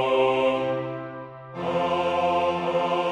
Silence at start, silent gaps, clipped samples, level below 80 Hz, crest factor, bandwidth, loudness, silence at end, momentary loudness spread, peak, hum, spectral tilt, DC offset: 0 s; none; under 0.1%; -60 dBFS; 14 dB; 9.6 kHz; -24 LUFS; 0 s; 14 LU; -10 dBFS; none; -6 dB/octave; under 0.1%